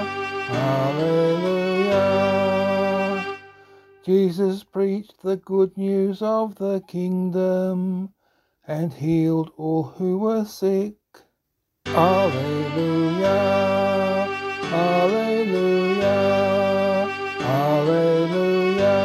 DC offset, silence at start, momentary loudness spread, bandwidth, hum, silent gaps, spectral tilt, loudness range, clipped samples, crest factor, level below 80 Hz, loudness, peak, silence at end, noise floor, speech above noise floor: under 0.1%; 0 s; 8 LU; 13.5 kHz; none; none; -7 dB/octave; 4 LU; under 0.1%; 18 dB; -62 dBFS; -21 LUFS; -4 dBFS; 0 s; -76 dBFS; 55 dB